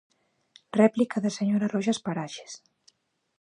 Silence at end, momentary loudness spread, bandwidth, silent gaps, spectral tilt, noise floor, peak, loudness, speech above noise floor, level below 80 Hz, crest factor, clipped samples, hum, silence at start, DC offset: 0.85 s; 18 LU; 10.5 kHz; none; -6 dB/octave; -65 dBFS; -8 dBFS; -26 LUFS; 39 dB; -74 dBFS; 20 dB; under 0.1%; none; 0.75 s; under 0.1%